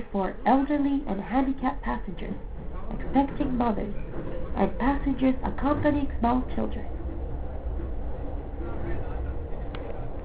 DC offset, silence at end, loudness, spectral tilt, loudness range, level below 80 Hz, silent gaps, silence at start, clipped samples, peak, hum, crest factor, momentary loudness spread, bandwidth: 0.6%; 0 s; -29 LUFS; -11.5 dB/octave; 8 LU; -36 dBFS; none; 0 s; under 0.1%; -8 dBFS; none; 18 dB; 12 LU; 4 kHz